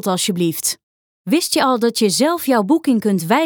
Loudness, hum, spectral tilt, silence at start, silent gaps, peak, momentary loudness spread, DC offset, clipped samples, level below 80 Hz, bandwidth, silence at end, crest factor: -17 LUFS; none; -4 dB/octave; 0.05 s; 0.83-1.25 s; -2 dBFS; 5 LU; under 0.1%; under 0.1%; -68 dBFS; over 20 kHz; 0 s; 14 dB